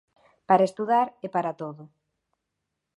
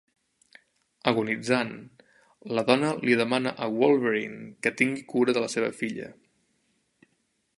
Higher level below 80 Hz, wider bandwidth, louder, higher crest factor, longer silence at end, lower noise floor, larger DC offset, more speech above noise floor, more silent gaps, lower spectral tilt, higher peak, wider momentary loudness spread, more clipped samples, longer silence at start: second, -78 dBFS vs -72 dBFS; about the same, 11.5 kHz vs 11.5 kHz; about the same, -24 LUFS vs -26 LUFS; about the same, 22 dB vs 24 dB; second, 1.1 s vs 1.45 s; first, -82 dBFS vs -73 dBFS; neither; first, 58 dB vs 47 dB; neither; first, -7 dB/octave vs -5 dB/octave; about the same, -6 dBFS vs -4 dBFS; first, 13 LU vs 10 LU; neither; second, 0.5 s vs 1.05 s